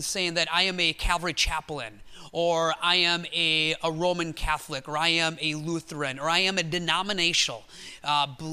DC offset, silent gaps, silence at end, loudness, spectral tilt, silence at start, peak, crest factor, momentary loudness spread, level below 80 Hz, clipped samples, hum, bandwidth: under 0.1%; none; 0 s; -25 LUFS; -2.5 dB/octave; 0 s; -8 dBFS; 20 dB; 10 LU; -42 dBFS; under 0.1%; none; 15.5 kHz